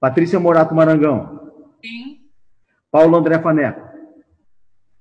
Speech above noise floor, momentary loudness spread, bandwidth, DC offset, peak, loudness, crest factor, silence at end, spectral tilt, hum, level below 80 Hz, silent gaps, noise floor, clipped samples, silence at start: 47 dB; 21 LU; 7.8 kHz; under 0.1%; -2 dBFS; -14 LUFS; 14 dB; 0.95 s; -9 dB/octave; none; -58 dBFS; none; -61 dBFS; under 0.1%; 0 s